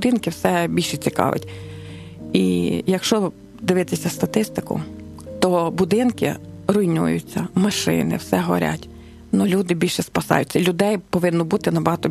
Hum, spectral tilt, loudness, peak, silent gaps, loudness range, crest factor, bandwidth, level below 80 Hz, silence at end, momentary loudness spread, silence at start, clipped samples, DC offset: none; -5.5 dB/octave; -21 LUFS; 0 dBFS; none; 2 LU; 20 dB; 14 kHz; -50 dBFS; 0 s; 9 LU; 0 s; under 0.1%; under 0.1%